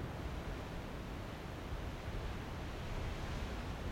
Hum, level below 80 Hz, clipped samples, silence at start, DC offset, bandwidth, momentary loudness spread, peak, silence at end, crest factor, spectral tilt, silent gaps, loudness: none; -46 dBFS; under 0.1%; 0 s; under 0.1%; 16.5 kHz; 3 LU; -30 dBFS; 0 s; 14 dB; -6 dB/octave; none; -45 LUFS